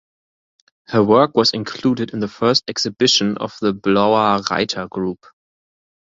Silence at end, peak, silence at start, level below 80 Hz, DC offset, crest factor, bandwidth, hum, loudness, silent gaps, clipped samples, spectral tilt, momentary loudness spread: 0.95 s; -2 dBFS; 0.9 s; -56 dBFS; under 0.1%; 18 dB; 7.8 kHz; none; -17 LUFS; none; under 0.1%; -4.5 dB/octave; 10 LU